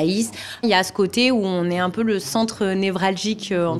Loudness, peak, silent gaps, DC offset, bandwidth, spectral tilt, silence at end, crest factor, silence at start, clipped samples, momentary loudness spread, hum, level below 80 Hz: -21 LUFS; -2 dBFS; none; under 0.1%; 15.5 kHz; -4.5 dB/octave; 0 s; 18 dB; 0 s; under 0.1%; 5 LU; none; -60 dBFS